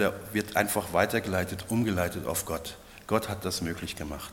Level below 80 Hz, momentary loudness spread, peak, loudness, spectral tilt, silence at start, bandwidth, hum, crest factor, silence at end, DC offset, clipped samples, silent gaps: -54 dBFS; 10 LU; -8 dBFS; -30 LUFS; -4.5 dB/octave; 0 s; 17.5 kHz; none; 22 dB; 0 s; under 0.1%; under 0.1%; none